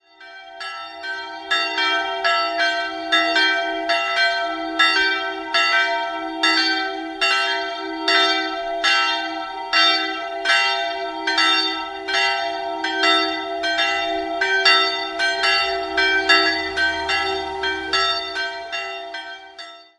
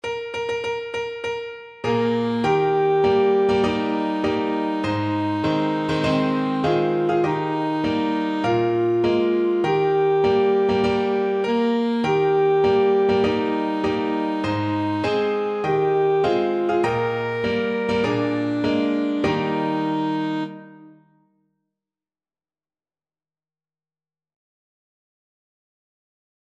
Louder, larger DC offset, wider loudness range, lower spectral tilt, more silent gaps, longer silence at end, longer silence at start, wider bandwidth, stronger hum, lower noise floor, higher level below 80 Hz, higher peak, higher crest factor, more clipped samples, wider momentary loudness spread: about the same, -19 LUFS vs -21 LUFS; neither; about the same, 2 LU vs 4 LU; second, -0.5 dB/octave vs -7 dB/octave; neither; second, 0.15 s vs 5.6 s; first, 0.2 s vs 0.05 s; first, 11.5 kHz vs 8.6 kHz; neither; second, -41 dBFS vs under -90 dBFS; about the same, -54 dBFS vs -54 dBFS; first, 0 dBFS vs -8 dBFS; first, 20 dB vs 14 dB; neither; first, 12 LU vs 6 LU